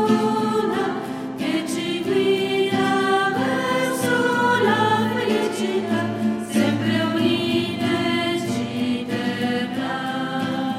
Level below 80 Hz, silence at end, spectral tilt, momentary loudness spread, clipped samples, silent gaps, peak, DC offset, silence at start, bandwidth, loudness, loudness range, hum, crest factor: -62 dBFS; 0 s; -5 dB/octave; 6 LU; under 0.1%; none; -6 dBFS; under 0.1%; 0 s; 16 kHz; -21 LUFS; 3 LU; none; 14 dB